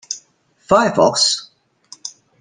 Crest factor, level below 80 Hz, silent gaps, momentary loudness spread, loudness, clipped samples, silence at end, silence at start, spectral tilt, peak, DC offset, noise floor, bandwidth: 18 dB; -56 dBFS; none; 20 LU; -15 LUFS; under 0.1%; 0.3 s; 0.1 s; -2.5 dB/octave; -2 dBFS; under 0.1%; -57 dBFS; 10.5 kHz